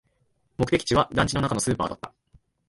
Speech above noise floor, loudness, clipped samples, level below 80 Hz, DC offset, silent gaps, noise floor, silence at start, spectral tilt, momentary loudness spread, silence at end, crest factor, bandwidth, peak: 45 dB; -24 LUFS; under 0.1%; -46 dBFS; under 0.1%; none; -69 dBFS; 0.6 s; -4.5 dB/octave; 18 LU; 0.6 s; 20 dB; 12 kHz; -6 dBFS